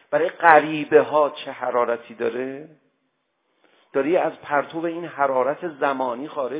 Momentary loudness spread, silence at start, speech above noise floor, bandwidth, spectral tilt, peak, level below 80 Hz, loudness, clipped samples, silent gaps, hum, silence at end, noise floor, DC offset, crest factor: 12 LU; 0.1 s; 51 dB; 4 kHz; -9 dB/octave; 0 dBFS; -76 dBFS; -21 LUFS; under 0.1%; none; none; 0 s; -72 dBFS; under 0.1%; 22 dB